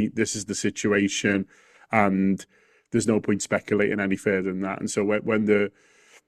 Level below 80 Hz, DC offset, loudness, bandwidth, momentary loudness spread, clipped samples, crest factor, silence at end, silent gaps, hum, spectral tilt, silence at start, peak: -62 dBFS; under 0.1%; -24 LUFS; 13 kHz; 6 LU; under 0.1%; 22 dB; 0.6 s; none; none; -5 dB/octave; 0 s; -2 dBFS